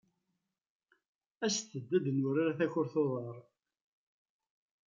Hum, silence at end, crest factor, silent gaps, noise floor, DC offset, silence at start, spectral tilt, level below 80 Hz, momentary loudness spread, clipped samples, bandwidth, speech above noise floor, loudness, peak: none; 1.45 s; 18 dB; none; -85 dBFS; under 0.1%; 1.4 s; -5 dB/octave; -84 dBFS; 9 LU; under 0.1%; 9.2 kHz; 52 dB; -34 LUFS; -18 dBFS